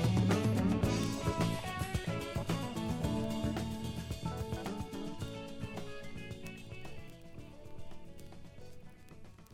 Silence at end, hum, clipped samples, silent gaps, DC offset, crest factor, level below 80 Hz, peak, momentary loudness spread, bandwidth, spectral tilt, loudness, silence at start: 0 s; none; under 0.1%; none; under 0.1%; 18 dB; -50 dBFS; -18 dBFS; 22 LU; 16.5 kHz; -6 dB/octave; -37 LUFS; 0 s